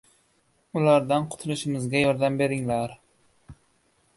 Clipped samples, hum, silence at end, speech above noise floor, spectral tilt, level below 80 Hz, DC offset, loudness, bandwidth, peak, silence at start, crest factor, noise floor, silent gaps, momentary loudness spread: under 0.1%; none; 0.65 s; 43 dB; -6 dB/octave; -60 dBFS; under 0.1%; -25 LUFS; 11.5 kHz; -6 dBFS; 0.75 s; 20 dB; -67 dBFS; none; 9 LU